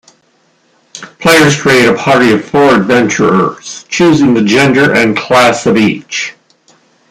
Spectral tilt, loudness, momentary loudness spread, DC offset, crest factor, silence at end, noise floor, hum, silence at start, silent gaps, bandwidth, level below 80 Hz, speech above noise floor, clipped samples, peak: -4.5 dB/octave; -8 LUFS; 11 LU; under 0.1%; 10 dB; 0.8 s; -53 dBFS; none; 0.95 s; none; 16.5 kHz; -46 dBFS; 45 dB; under 0.1%; 0 dBFS